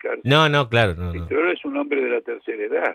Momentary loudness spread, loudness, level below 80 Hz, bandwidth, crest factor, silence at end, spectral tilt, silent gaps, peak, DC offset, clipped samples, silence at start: 11 LU; -21 LUFS; -44 dBFS; 14 kHz; 18 dB; 0 s; -6 dB/octave; none; -4 dBFS; under 0.1%; under 0.1%; 0.05 s